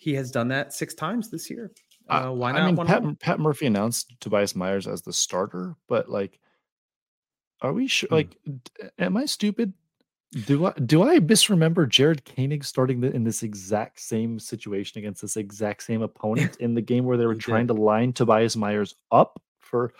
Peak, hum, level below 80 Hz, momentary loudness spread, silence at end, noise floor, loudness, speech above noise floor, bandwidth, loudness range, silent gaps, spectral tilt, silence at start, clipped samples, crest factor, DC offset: -4 dBFS; none; -66 dBFS; 13 LU; 0.1 s; -75 dBFS; -24 LUFS; 51 dB; 16.5 kHz; 8 LU; 6.72-6.89 s, 6.96-7.23 s, 7.47-7.51 s, 10.20-10.24 s, 19.48-19.55 s; -5 dB/octave; 0.05 s; under 0.1%; 22 dB; under 0.1%